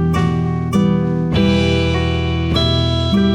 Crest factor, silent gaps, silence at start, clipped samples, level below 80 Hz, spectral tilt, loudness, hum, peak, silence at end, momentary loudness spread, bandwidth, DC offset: 12 dB; none; 0 s; under 0.1%; -32 dBFS; -7 dB/octave; -16 LUFS; none; -2 dBFS; 0 s; 3 LU; 10.5 kHz; under 0.1%